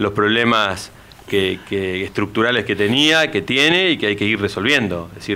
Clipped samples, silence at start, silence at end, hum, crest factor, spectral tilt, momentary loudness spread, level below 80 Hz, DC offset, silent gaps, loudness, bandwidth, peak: under 0.1%; 0 s; 0 s; none; 14 dB; -4 dB/octave; 9 LU; -50 dBFS; under 0.1%; none; -17 LUFS; 16 kHz; -4 dBFS